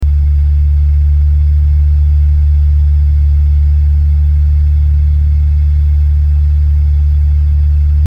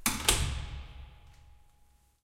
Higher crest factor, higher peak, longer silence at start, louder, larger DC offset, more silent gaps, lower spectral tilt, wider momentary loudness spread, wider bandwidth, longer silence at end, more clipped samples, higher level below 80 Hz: second, 6 dB vs 28 dB; first, -2 dBFS vs -6 dBFS; about the same, 0 s vs 0 s; first, -11 LUFS vs -30 LUFS; neither; neither; first, -9.5 dB/octave vs -2 dB/octave; second, 1 LU vs 25 LU; second, 2.2 kHz vs 16.5 kHz; second, 0 s vs 0.7 s; neither; first, -8 dBFS vs -42 dBFS